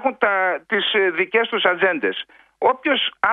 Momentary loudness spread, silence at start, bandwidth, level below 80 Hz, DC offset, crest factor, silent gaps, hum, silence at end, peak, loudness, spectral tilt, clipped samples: 6 LU; 0 s; 4.7 kHz; -66 dBFS; under 0.1%; 18 dB; none; none; 0 s; -2 dBFS; -19 LUFS; -6 dB/octave; under 0.1%